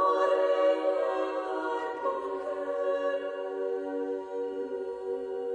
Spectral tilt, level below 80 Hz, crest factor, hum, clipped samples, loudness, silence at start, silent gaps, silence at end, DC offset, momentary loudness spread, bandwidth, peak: -4 dB/octave; -74 dBFS; 16 dB; none; under 0.1%; -31 LUFS; 0 s; none; 0 s; under 0.1%; 9 LU; 9.6 kHz; -14 dBFS